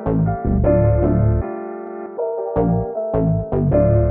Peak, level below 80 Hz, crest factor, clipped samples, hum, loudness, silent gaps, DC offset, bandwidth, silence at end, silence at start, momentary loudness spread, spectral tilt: -2 dBFS; -26 dBFS; 14 dB; under 0.1%; none; -19 LUFS; none; under 0.1%; 2.6 kHz; 0 s; 0 s; 12 LU; -12.5 dB/octave